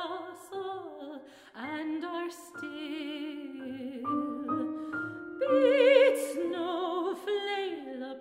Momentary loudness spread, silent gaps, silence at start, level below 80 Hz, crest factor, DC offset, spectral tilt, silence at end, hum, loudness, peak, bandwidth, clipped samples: 18 LU; none; 0 s; -78 dBFS; 20 dB; under 0.1%; -4 dB/octave; 0 s; none; -31 LUFS; -10 dBFS; 15.5 kHz; under 0.1%